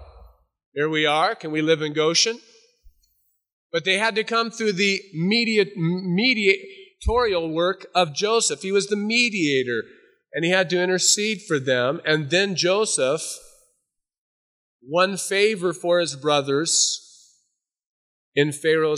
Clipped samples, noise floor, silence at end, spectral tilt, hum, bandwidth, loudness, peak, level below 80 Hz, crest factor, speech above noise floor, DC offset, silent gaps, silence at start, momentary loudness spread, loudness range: under 0.1%; -76 dBFS; 0 s; -3 dB/octave; none; 15 kHz; -21 LUFS; -4 dBFS; -46 dBFS; 20 dB; 55 dB; under 0.1%; 0.66-0.72 s, 3.52-3.70 s, 14.18-14.79 s, 17.86-18.32 s; 0 s; 8 LU; 3 LU